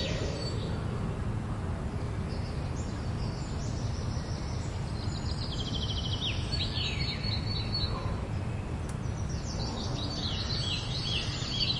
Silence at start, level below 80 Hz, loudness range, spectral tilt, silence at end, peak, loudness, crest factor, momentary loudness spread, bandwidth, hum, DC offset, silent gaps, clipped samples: 0 s; -40 dBFS; 3 LU; -5 dB/octave; 0 s; -18 dBFS; -33 LUFS; 16 dB; 5 LU; 11.5 kHz; none; under 0.1%; none; under 0.1%